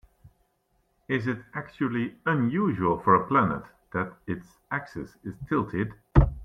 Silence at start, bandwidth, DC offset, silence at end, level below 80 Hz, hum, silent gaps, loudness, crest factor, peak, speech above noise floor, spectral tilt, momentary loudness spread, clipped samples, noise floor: 1.1 s; 6.6 kHz; under 0.1%; 0 s; -36 dBFS; none; none; -27 LUFS; 24 dB; -4 dBFS; 44 dB; -9 dB/octave; 15 LU; under 0.1%; -71 dBFS